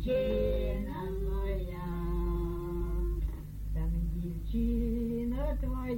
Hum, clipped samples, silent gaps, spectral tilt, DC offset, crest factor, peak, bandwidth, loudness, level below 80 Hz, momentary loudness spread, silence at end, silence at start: none; under 0.1%; none; -8.5 dB/octave; under 0.1%; 12 dB; -18 dBFS; 17 kHz; -34 LUFS; -34 dBFS; 6 LU; 0 s; 0 s